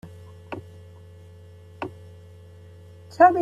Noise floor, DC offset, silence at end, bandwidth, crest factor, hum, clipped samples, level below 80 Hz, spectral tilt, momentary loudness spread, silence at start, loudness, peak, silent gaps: -46 dBFS; under 0.1%; 0 s; 7.6 kHz; 24 dB; none; under 0.1%; -64 dBFS; -7 dB/octave; 20 LU; 0.5 s; -25 LUFS; -4 dBFS; none